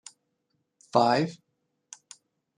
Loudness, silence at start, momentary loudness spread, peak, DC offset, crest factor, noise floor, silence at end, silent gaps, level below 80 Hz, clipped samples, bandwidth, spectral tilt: -25 LUFS; 0.95 s; 26 LU; -6 dBFS; under 0.1%; 24 dB; -78 dBFS; 1.25 s; none; -76 dBFS; under 0.1%; 10.5 kHz; -5.5 dB/octave